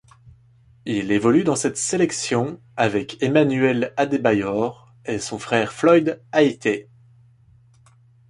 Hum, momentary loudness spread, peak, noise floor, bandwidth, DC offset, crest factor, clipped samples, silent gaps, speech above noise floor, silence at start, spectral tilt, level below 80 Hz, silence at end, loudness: none; 10 LU; -4 dBFS; -53 dBFS; 11.5 kHz; under 0.1%; 18 dB; under 0.1%; none; 34 dB; 0.25 s; -5 dB/octave; -58 dBFS; 1.45 s; -21 LUFS